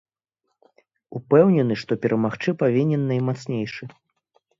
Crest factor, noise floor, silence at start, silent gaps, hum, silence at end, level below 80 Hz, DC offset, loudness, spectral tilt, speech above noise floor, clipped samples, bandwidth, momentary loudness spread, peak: 20 dB; -78 dBFS; 1.1 s; none; none; 0.7 s; -64 dBFS; under 0.1%; -21 LUFS; -8.5 dB/octave; 57 dB; under 0.1%; 7.6 kHz; 20 LU; -4 dBFS